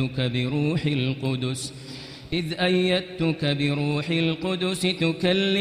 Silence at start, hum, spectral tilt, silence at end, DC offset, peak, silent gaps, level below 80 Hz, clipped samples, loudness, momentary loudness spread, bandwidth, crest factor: 0 s; none; -5.5 dB/octave; 0 s; under 0.1%; -8 dBFS; none; -52 dBFS; under 0.1%; -24 LUFS; 8 LU; 15.5 kHz; 16 dB